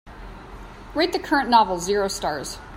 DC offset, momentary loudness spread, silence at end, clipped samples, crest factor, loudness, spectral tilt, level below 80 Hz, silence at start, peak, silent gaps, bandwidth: under 0.1%; 23 LU; 0 s; under 0.1%; 20 dB; -22 LUFS; -3.5 dB/octave; -44 dBFS; 0.05 s; -4 dBFS; none; 16 kHz